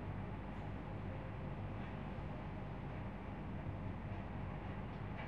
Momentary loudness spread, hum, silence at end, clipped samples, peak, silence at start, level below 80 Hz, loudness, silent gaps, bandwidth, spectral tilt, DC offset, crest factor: 1 LU; none; 0 s; under 0.1%; -32 dBFS; 0 s; -52 dBFS; -47 LUFS; none; 6.4 kHz; -9 dB/octave; 0.1%; 12 dB